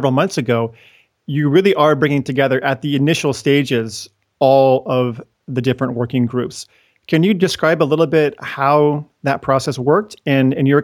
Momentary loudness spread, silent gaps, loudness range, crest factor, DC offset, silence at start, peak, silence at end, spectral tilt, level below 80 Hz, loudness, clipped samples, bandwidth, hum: 9 LU; none; 2 LU; 16 dB; under 0.1%; 0 s; 0 dBFS; 0 s; -6 dB/octave; -56 dBFS; -16 LUFS; under 0.1%; 18.5 kHz; none